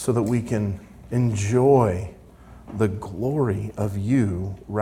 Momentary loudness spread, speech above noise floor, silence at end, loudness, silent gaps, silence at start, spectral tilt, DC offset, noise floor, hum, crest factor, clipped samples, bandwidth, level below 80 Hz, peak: 13 LU; 24 dB; 0 s; -23 LUFS; none; 0 s; -7.5 dB/octave; under 0.1%; -46 dBFS; none; 18 dB; under 0.1%; 15 kHz; -48 dBFS; -4 dBFS